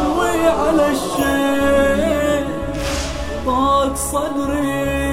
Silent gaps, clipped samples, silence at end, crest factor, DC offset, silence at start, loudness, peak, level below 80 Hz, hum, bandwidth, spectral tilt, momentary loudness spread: none; under 0.1%; 0 s; 14 dB; under 0.1%; 0 s; -18 LUFS; -2 dBFS; -30 dBFS; none; 16.5 kHz; -4.5 dB/octave; 7 LU